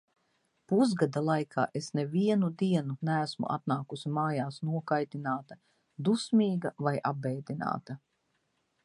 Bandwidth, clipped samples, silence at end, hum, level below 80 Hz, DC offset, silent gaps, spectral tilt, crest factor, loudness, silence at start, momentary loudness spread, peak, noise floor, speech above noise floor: 11 kHz; under 0.1%; 0.9 s; none; -76 dBFS; under 0.1%; none; -7 dB/octave; 18 dB; -31 LUFS; 0.7 s; 8 LU; -12 dBFS; -77 dBFS; 47 dB